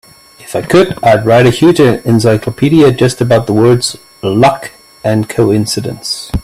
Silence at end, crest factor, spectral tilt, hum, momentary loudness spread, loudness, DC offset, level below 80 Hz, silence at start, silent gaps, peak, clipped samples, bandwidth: 0 s; 10 dB; -6 dB/octave; none; 11 LU; -10 LUFS; under 0.1%; -34 dBFS; 0.4 s; none; 0 dBFS; under 0.1%; 15 kHz